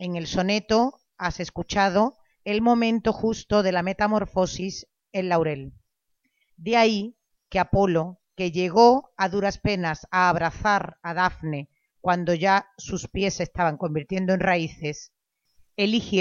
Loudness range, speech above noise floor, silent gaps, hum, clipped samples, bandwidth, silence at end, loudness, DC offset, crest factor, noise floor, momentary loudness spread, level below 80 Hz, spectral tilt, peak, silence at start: 4 LU; 51 dB; none; none; under 0.1%; 7.4 kHz; 0 s; -24 LUFS; under 0.1%; 20 dB; -74 dBFS; 12 LU; -48 dBFS; -5.5 dB/octave; -4 dBFS; 0 s